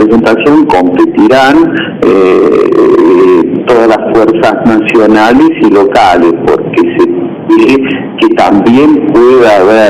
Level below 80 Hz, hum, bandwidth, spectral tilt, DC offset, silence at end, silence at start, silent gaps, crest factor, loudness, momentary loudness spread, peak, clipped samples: -38 dBFS; none; 10.5 kHz; -6.5 dB/octave; under 0.1%; 0 s; 0 s; none; 4 dB; -5 LUFS; 5 LU; 0 dBFS; 0.5%